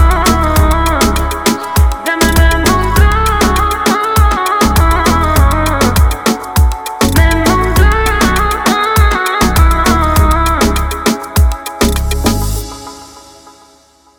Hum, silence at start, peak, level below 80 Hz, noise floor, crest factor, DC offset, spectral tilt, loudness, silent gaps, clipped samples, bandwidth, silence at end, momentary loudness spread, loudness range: none; 0 s; 0 dBFS; -14 dBFS; -46 dBFS; 10 dB; 0.7%; -5 dB/octave; -11 LUFS; none; under 0.1%; over 20 kHz; 0.7 s; 5 LU; 3 LU